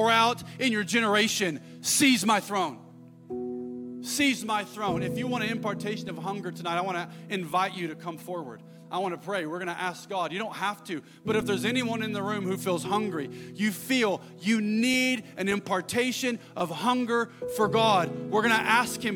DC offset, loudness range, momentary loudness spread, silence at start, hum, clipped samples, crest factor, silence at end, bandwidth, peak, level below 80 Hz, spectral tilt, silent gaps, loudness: under 0.1%; 6 LU; 13 LU; 0 s; none; under 0.1%; 20 dB; 0 s; 17.5 kHz; -8 dBFS; -68 dBFS; -3.5 dB/octave; none; -27 LUFS